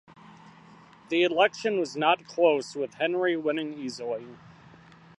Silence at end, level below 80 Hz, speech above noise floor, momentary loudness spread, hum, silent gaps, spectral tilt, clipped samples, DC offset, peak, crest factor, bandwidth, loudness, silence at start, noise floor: 0.7 s; -74 dBFS; 26 dB; 11 LU; none; none; -4.5 dB/octave; under 0.1%; under 0.1%; -8 dBFS; 20 dB; 11 kHz; -27 LUFS; 0.25 s; -53 dBFS